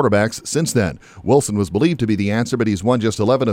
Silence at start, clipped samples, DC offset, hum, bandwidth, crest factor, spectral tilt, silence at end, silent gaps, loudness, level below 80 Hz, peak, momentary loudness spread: 0 s; under 0.1%; under 0.1%; none; 16.5 kHz; 14 dB; -5.5 dB/octave; 0 s; none; -18 LUFS; -46 dBFS; -2 dBFS; 4 LU